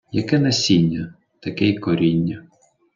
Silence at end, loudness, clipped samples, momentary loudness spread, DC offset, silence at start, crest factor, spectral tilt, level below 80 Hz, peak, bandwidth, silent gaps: 0.55 s; -19 LUFS; under 0.1%; 16 LU; under 0.1%; 0.15 s; 16 dB; -5.5 dB/octave; -54 dBFS; -4 dBFS; 7.6 kHz; none